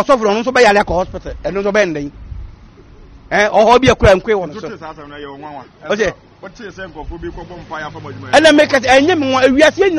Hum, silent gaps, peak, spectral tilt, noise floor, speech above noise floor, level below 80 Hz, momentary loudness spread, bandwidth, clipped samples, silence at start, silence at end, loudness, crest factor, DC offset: none; none; 0 dBFS; -4.5 dB/octave; -40 dBFS; 26 dB; -34 dBFS; 22 LU; 11.5 kHz; under 0.1%; 0 s; 0 s; -12 LUFS; 14 dB; under 0.1%